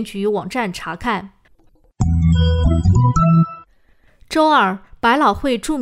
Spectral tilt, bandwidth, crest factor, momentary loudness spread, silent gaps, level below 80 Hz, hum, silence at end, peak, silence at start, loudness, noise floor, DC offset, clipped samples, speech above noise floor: -6.5 dB/octave; 12.5 kHz; 14 dB; 9 LU; none; -30 dBFS; none; 0 s; -2 dBFS; 0 s; -17 LUFS; -53 dBFS; under 0.1%; under 0.1%; 37 dB